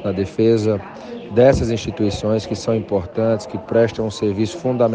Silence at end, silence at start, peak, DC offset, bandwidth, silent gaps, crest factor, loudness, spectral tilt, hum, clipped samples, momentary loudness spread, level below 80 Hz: 0 s; 0 s; 0 dBFS; under 0.1%; 9.6 kHz; none; 18 dB; -19 LUFS; -7 dB/octave; none; under 0.1%; 8 LU; -40 dBFS